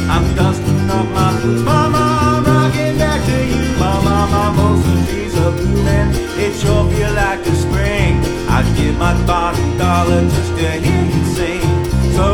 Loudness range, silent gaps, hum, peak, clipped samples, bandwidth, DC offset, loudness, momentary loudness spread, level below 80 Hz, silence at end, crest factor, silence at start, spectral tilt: 1 LU; none; none; 0 dBFS; under 0.1%; 17.5 kHz; under 0.1%; -14 LUFS; 3 LU; -22 dBFS; 0 s; 14 dB; 0 s; -6 dB/octave